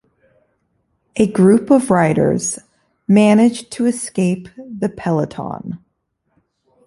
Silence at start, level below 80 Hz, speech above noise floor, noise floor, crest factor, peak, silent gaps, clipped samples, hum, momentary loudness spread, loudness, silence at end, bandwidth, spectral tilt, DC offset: 1.15 s; -52 dBFS; 54 dB; -69 dBFS; 16 dB; -2 dBFS; none; under 0.1%; none; 17 LU; -16 LUFS; 1.1 s; 11.5 kHz; -6 dB/octave; under 0.1%